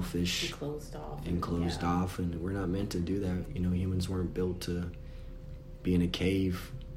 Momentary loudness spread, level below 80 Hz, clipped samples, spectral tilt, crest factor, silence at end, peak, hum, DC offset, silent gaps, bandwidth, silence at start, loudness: 12 LU; -46 dBFS; under 0.1%; -6 dB/octave; 16 dB; 0 s; -18 dBFS; none; under 0.1%; none; 16 kHz; 0 s; -33 LUFS